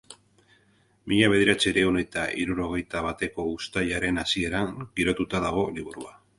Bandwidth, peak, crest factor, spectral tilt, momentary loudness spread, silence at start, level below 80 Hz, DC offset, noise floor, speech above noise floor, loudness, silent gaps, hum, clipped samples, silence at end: 11.5 kHz; -6 dBFS; 20 dB; -4.5 dB/octave; 10 LU; 0.1 s; -48 dBFS; under 0.1%; -63 dBFS; 37 dB; -25 LUFS; none; none; under 0.1%; 0.25 s